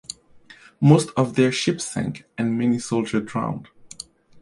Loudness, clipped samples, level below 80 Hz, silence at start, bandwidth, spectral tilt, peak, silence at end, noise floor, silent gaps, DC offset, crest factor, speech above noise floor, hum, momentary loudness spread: -22 LUFS; under 0.1%; -58 dBFS; 0.8 s; 11.5 kHz; -6 dB/octave; -2 dBFS; 0.55 s; -49 dBFS; none; under 0.1%; 20 dB; 29 dB; none; 22 LU